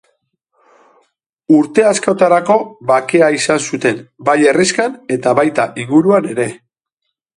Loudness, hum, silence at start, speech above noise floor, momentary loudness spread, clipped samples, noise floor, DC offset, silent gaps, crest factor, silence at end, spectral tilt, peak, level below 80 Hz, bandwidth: -13 LUFS; none; 1.5 s; 62 dB; 7 LU; under 0.1%; -75 dBFS; under 0.1%; none; 14 dB; 0.8 s; -4.5 dB/octave; 0 dBFS; -58 dBFS; 11.5 kHz